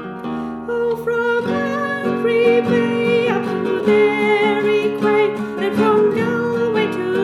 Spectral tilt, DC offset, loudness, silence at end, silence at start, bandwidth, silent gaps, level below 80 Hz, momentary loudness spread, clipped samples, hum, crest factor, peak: -6.5 dB/octave; under 0.1%; -17 LUFS; 0 s; 0 s; 12.5 kHz; none; -58 dBFS; 6 LU; under 0.1%; none; 14 dB; -4 dBFS